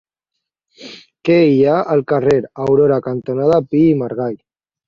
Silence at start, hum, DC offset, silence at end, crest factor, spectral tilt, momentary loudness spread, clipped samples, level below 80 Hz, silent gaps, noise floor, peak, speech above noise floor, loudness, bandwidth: 0.8 s; none; under 0.1%; 0.5 s; 14 dB; -8.5 dB/octave; 15 LU; under 0.1%; -54 dBFS; none; -78 dBFS; -2 dBFS; 65 dB; -15 LUFS; 7.4 kHz